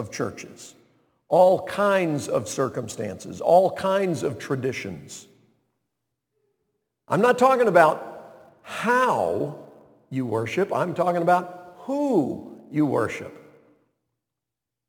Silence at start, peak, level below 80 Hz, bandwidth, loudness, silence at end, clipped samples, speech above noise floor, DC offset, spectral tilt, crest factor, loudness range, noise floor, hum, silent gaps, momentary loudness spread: 0 s; -2 dBFS; -66 dBFS; 19 kHz; -23 LUFS; 1.5 s; under 0.1%; 64 dB; under 0.1%; -5.5 dB/octave; 22 dB; 6 LU; -86 dBFS; none; none; 19 LU